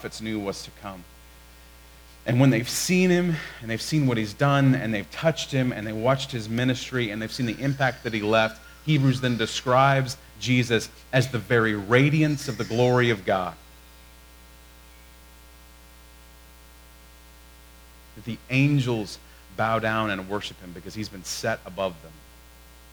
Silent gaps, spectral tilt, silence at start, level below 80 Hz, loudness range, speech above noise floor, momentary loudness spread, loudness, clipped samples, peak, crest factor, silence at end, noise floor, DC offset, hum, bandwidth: none; -5.5 dB/octave; 0 s; -52 dBFS; 7 LU; 25 dB; 15 LU; -24 LUFS; under 0.1%; -6 dBFS; 20 dB; 0.75 s; -49 dBFS; under 0.1%; 60 Hz at -50 dBFS; over 20 kHz